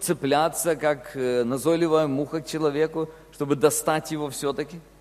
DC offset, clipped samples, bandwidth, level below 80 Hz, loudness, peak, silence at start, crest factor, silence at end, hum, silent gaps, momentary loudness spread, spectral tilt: under 0.1%; under 0.1%; 14.5 kHz; -58 dBFS; -24 LUFS; -4 dBFS; 0 s; 20 dB; 0.2 s; none; none; 10 LU; -4.5 dB/octave